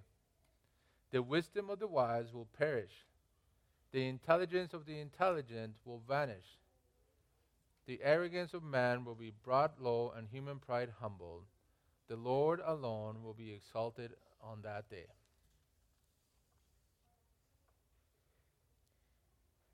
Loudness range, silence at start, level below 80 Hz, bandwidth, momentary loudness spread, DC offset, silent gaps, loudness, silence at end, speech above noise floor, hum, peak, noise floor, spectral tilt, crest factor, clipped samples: 12 LU; 1.15 s; -76 dBFS; 13.5 kHz; 17 LU; under 0.1%; none; -39 LUFS; 4.6 s; 39 dB; none; -16 dBFS; -78 dBFS; -7 dB/octave; 24 dB; under 0.1%